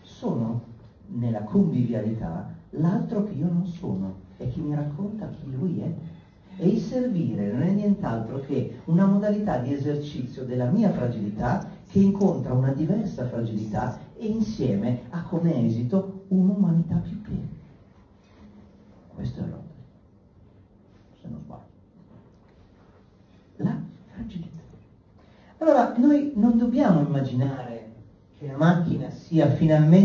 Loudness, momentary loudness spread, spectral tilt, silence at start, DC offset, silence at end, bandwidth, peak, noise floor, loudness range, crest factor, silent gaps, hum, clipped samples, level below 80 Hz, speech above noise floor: -25 LUFS; 16 LU; -9.5 dB/octave; 0.1 s; under 0.1%; 0 s; 7 kHz; -6 dBFS; -55 dBFS; 15 LU; 20 dB; none; none; under 0.1%; -52 dBFS; 32 dB